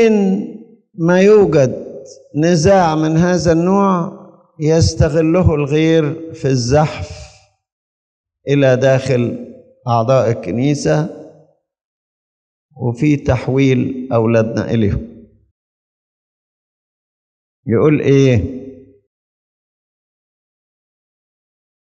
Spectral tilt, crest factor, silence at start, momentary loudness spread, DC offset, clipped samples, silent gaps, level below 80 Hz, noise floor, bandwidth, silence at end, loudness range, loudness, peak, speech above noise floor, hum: -7 dB/octave; 16 dB; 0 s; 15 LU; under 0.1%; under 0.1%; 7.72-8.24 s, 11.85-12.69 s, 15.51-17.63 s; -40 dBFS; -50 dBFS; 9.2 kHz; 3.1 s; 6 LU; -14 LUFS; 0 dBFS; 37 dB; none